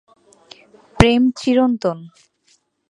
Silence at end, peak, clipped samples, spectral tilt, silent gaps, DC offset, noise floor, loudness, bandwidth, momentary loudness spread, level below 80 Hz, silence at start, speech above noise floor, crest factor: 0.85 s; 0 dBFS; under 0.1%; -6 dB/octave; none; under 0.1%; -61 dBFS; -16 LUFS; 11 kHz; 10 LU; -36 dBFS; 0.95 s; 44 dB; 20 dB